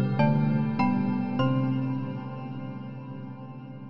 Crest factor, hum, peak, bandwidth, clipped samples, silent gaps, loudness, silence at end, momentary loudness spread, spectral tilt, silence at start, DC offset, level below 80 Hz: 18 dB; none; -10 dBFS; 5.8 kHz; under 0.1%; none; -27 LUFS; 0 s; 16 LU; -10 dB/octave; 0 s; 0.5%; -60 dBFS